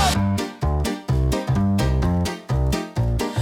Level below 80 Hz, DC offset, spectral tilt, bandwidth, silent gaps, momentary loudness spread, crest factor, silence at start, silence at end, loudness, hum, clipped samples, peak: -28 dBFS; under 0.1%; -6 dB/octave; 17.5 kHz; none; 4 LU; 14 dB; 0 s; 0 s; -22 LUFS; none; under 0.1%; -6 dBFS